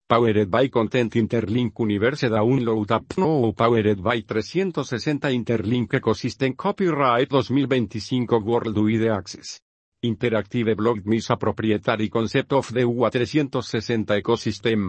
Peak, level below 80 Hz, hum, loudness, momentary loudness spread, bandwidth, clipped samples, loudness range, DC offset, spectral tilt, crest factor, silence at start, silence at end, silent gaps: -2 dBFS; -56 dBFS; none; -22 LUFS; 6 LU; 8.6 kHz; under 0.1%; 2 LU; under 0.1%; -6.5 dB/octave; 20 dB; 0.1 s; 0 s; 9.62-9.92 s